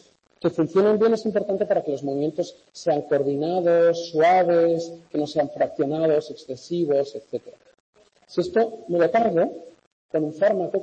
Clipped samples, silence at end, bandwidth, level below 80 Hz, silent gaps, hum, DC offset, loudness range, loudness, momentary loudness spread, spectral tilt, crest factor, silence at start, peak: under 0.1%; 0 s; 8.6 kHz; -68 dBFS; 7.80-7.93 s, 9.87-10.09 s; none; under 0.1%; 4 LU; -22 LUFS; 12 LU; -6.5 dB/octave; 14 dB; 0.45 s; -10 dBFS